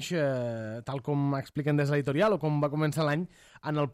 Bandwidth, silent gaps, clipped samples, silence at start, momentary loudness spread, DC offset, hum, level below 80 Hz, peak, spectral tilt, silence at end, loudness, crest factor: 14.5 kHz; none; under 0.1%; 0 s; 10 LU; under 0.1%; none; -64 dBFS; -14 dBFS; -7 dB/octave; 0 s; -29 LUFS; 14 dB